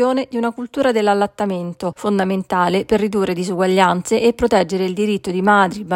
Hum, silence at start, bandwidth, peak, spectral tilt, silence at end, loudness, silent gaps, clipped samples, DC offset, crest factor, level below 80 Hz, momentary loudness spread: none; 0 s; 16 kHz; 0 dBFS; -5.5 dB/octave; 0 s; -17 LUFS; none; under 0.1%; under 0.1%; 16 dB; -48 dBFS; 8 LU